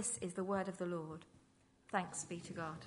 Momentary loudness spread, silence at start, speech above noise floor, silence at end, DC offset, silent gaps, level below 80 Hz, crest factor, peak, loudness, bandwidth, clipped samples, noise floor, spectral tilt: 6 LU; 0 s; 28 dB; 0 s; under 0.1%; none; -76 dBFS; 22 dB; -22 dBFS; -42 LUFS; 11 kHz; under 0.1%; -71 dBFS; -4.5 dB/octave